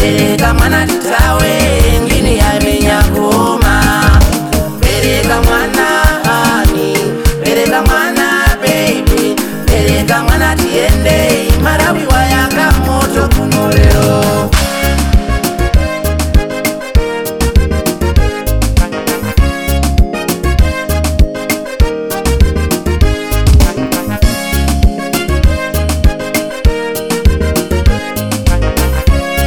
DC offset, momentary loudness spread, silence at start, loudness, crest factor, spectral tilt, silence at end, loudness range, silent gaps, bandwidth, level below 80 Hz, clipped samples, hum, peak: under 0.1%; 5 LU; 0 s; -11 LUFS; 10 dB; -5 dB/octave; 0 s; 3 LU; none; 19.5 kHz; -14 dBFS; under 0.1%; none; 0 dBFS